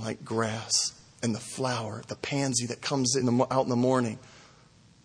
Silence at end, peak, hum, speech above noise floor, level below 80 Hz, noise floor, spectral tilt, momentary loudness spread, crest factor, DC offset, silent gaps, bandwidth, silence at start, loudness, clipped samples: 0.65 s; -10 dBFS; none; 29 dB; -66 dBFS; -58 dBFS; -4 dB/octave; 9 LU; 20 dB; under 0.1%; none; 10.5 kHz; 0 s; -28 LUFS; under 0.1%